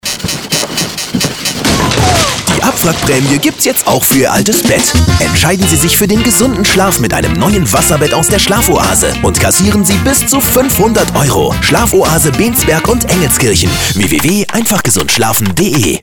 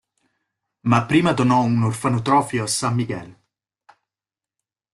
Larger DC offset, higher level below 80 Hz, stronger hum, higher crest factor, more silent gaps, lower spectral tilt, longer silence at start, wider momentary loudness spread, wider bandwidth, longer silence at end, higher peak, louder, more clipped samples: neither; first, -24 dBFS vs -56 dBFS; neither; second, 10 dB vs 18 dB; neither; second, -3.5 dB/octave vs -5.5 dB/octave; second, 0.05 s vs 0.85 s; second, 3 LU vs 9 LU; first, over 20 kHz vs 12.5 kHz; second, 0.05 s vs 1.6 s; first, 0 dBFS vs -4 dBFS; first, -9 LUFS vs -20 LUFS; neither